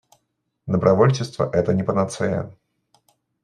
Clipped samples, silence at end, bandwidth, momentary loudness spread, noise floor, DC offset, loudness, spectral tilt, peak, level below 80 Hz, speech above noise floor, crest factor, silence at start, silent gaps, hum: under 0.1%; 0.9 s; 11 kHz; 12 LU; -74 dBFS; under 0.1%; -21 LUFS; -7 dB/octave; -2 dBFS; -56 dBFS; 54 dB; 20 dB; 0.65 s; none; none